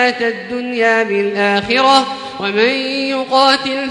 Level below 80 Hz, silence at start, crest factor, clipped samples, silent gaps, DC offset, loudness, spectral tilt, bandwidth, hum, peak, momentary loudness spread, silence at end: -56 dBFS; 0 s; 14 dB; under 0.1%; none; under 0.1%; -14 LUFS; -3.5 dB/octave; 11.5 kHz; none; 0 dBFS; 9 LU; 0 s